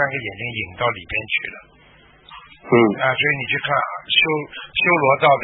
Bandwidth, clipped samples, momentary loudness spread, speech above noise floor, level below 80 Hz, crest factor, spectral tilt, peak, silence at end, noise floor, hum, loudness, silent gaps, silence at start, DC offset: 4.1 kHz; under 0.1%; 11 LU; 31 dB; -52 dBFS; 18 dB; -10 dB/octave; -2 dBFS; 0 s; -50 dBFS; none; -19 LUFS; none; 0 s; under 0.1%